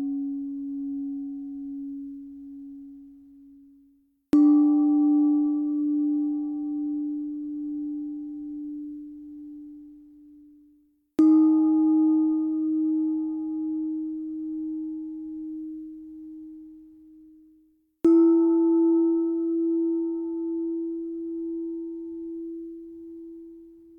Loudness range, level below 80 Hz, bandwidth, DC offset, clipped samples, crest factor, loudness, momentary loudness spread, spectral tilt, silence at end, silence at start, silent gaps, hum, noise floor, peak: 14 LU; -66 dBFS; 2 kHz; under 0.1%; under 0.1%; 16 dB; -25 LUFS; 22 LU; -9 dB/octave; 0.25 s; 0 s; none; none; -63 dBFS; -10 dBFS